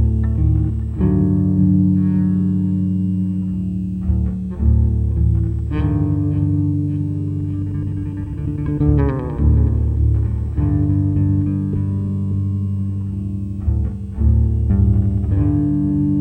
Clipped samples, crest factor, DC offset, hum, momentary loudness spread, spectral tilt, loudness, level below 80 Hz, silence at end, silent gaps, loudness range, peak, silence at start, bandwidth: under 0.1%; 14 dB; under 0.1%; none; 7 LU; -12 dB/octave; -19 LUFS; -22 dBFS; 0 s; none; 3 LU; -2 dBFS; 0 s; 3.1 kHz